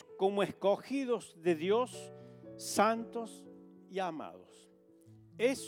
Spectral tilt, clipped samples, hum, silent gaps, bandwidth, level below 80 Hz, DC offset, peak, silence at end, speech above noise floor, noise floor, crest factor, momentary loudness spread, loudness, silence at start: -4.5 dB/octave; under 0.1%; none; none; 17.5 kHz; -80 dBFS; under 0.1%; -14 dBFS; 0 s; 28 dB; -62 dBFS; 22 dB; 20 LU; -34 LUFS; 0.1 s